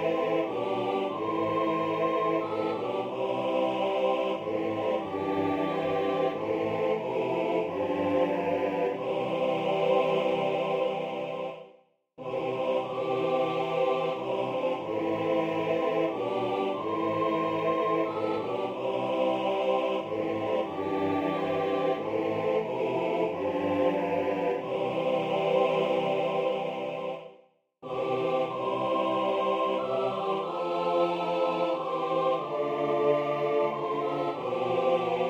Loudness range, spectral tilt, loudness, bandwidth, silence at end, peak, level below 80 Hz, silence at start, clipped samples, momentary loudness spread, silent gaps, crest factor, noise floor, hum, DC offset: 2 LU; -7 dB/octave; -29 LUFS; 8.2 kHz; 0 s; -12 dBFS; -70 dBFS; 0 s; under 0.1%; 4 LU; none; 16 dB; -60 dBFS; none; under 0.1%